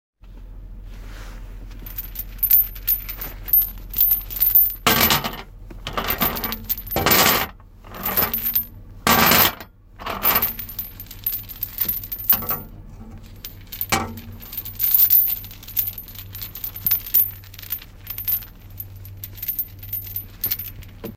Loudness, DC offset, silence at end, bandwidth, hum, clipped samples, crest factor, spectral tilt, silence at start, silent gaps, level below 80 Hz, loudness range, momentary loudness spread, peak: -19 LUFS; under 0.1%; 0 s; 17 kHz; none; under 0.1%; 24 dB; -2.5 dB/octave; 0.25 s; none; -40 dBFS; 6 LU; 22 LU; 0 dBFS